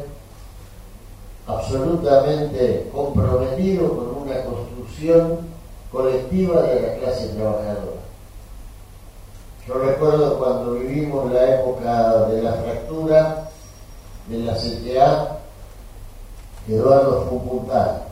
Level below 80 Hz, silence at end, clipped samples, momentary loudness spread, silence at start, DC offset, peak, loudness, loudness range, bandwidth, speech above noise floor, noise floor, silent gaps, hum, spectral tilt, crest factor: -38 dBFS; 0 s; under 0.1%; 14 LU; 0 s; under 0.1%; -2 dBFS; -20 LUFS; 4 LU; 16 kHz; 22 dB; -40 dBFS; none; none; -7.5 dB/octave; 18 dB